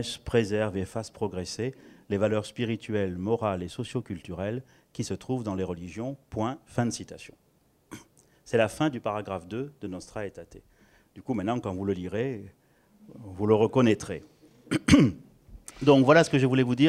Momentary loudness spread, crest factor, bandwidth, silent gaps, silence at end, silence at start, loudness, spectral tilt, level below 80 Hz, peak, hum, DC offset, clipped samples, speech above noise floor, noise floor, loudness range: 20 LU; 22 dB; 14 kHz; none; 0 s; 0 s; -28 LUFS; -6 dB/octave; -54 dBFS; -6 dBFS; none; under 0.1%; under 0.1%; 32 dB; -59 dBFS; 10 LU